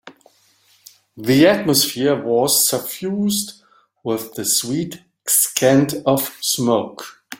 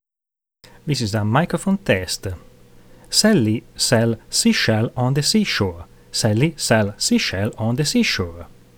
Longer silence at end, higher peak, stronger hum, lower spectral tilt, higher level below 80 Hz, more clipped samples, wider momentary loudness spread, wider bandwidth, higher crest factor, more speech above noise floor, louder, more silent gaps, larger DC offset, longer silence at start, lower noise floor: second, 0.05 s vs 0.3 s; about the same, 0 dBFS vs -2 dBFS; neither; about the same, -3.5 dB/octave vs -4.5 dB/octave; second, -58 dBFS vs -48 dBFS; neither; first, 14 LU vs 9 LU; second, 17 kHz vs over 20 kHz; about the same, 20 dB vs 18 dB; second, 39 dB vs 65 dB; about the same, -17 LUFS vs -19 LUFS; neither; neither; second, 0.05 s vs 0.85 s; second, -57 dBFS vs -84 dBFS